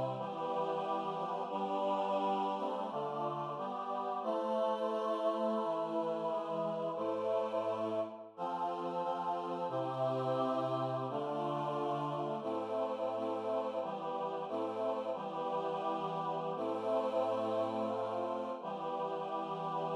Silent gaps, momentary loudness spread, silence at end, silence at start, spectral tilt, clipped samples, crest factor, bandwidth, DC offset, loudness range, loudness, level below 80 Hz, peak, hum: none; 5 LU; 0 s; 0 s; -7 dB/octave; under 0.1%; 14 dB; 10.5 kHz; under 0.1%; 2 LU; -37 LUFS; under -90 dBFS; -22 dBFS; none